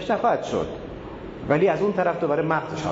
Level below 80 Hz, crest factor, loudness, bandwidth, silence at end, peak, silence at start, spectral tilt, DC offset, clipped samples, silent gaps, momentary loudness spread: -48 dBFS; 18 dB; -23 LUFS; 7.8 kHz; 0 s; -6 dBFS; 0 s; -6.5 dB/octave; under 0.1%; under 0.1%; none; 15 LU